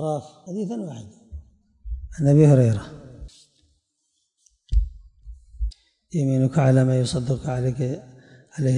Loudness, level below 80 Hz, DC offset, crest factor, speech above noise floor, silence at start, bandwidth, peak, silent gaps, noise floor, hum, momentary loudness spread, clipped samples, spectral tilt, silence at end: -22 LUFS; -34 dBFS; under 0.1%; 18 dB; 53 dB; 0 s; 10.5 kHz; -6 dBFS; none; -73 dBFS; none; 24 LU; under 0.1%; -8 dB/octave; 0 s